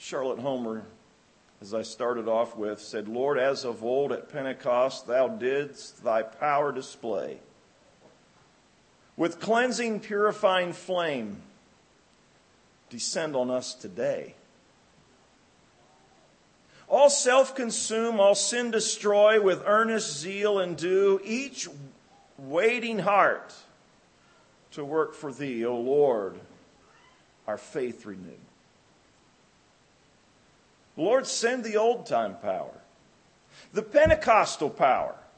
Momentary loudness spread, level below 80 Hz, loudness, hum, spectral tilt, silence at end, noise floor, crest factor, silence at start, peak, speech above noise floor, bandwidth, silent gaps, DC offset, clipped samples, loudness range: 16 LU; -58 dBFS; -26 LUFS; none; -3 dB/octave; 0.2 s; -62 dBFS; 22 dB; 0 s; -6 dBFS; 36 dB; 8.8 kHz; none; under 0.1%; under 0.1%; 10 LU